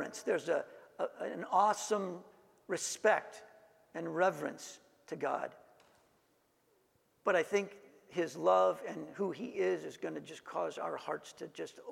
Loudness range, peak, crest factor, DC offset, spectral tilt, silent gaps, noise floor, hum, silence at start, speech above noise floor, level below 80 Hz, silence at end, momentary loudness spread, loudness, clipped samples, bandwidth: 5 LU; -14 dBFS; 22 dB; under 0.1%; -4 dB/octave; none; -74 dBFS; none; 0 s; 38 dB; -86 dBFS; 0 s; 17 LU; -36 LUFS; under 0.1%; 16 kHz